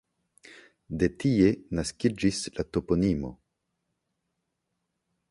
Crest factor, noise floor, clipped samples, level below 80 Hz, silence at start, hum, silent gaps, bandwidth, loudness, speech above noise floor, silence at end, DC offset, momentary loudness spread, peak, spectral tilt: 20 dB; -81 dBFS; under 0.1%; -48 dBFS; 0.5 s; none; none; 11.5 kHz; -27 LUFS; 55 dB; 1.95 s; under 0.1%; 9 LU; -10 dBFS; -6 dB/octave